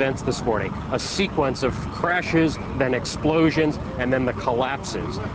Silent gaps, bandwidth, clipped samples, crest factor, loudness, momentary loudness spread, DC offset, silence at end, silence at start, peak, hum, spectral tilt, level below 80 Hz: none; 8 kHz; under 0.1%; 16 dB; -23 LUFS; 7 LU; under 0.1%; 0 s; 0 s; -8 dBFS; none; -5.5 dB/octave; -40 dBFS